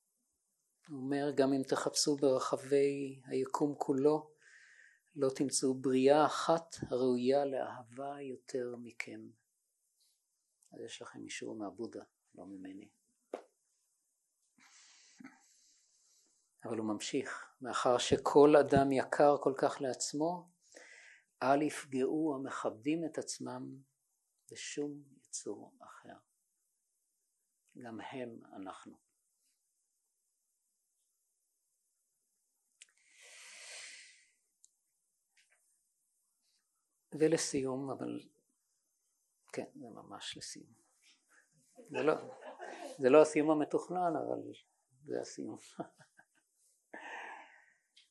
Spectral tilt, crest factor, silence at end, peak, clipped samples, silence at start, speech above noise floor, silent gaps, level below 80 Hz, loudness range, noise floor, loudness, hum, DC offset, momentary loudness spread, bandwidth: -4.5 dB/octave; 26 dB; 0.7 s; -12 dBFS; under 0.1%; 0.9 s; 49 dB; none; -72 dBFS; 22 LU; -84 dBFS; -34 LUFS; none; under 0.1%; 22 LU; 12 kHz